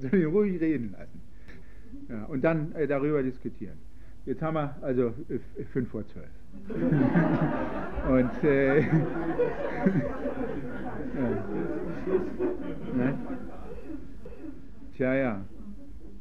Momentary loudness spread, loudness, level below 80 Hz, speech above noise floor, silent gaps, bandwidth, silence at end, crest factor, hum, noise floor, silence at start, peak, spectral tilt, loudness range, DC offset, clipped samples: 20 LU; -29 LUFS; -48 dBFS; 21 dB; none; 6.4 kHz; 0 s; 18 dB; none; -49 dBFS; 0 s; -10 dBFS; -10 dB/octave; 7 LU; 1%; under 0.1%